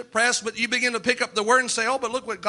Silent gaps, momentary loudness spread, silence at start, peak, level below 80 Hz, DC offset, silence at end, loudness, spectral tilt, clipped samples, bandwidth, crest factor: none; 4 LU; 0 s; -6 dBFS; -66 dBFS; under 0.1%; 0 s; -22 LUFS; -1 dB/octave; under 0.1%; 11.5 kHz; 18 dB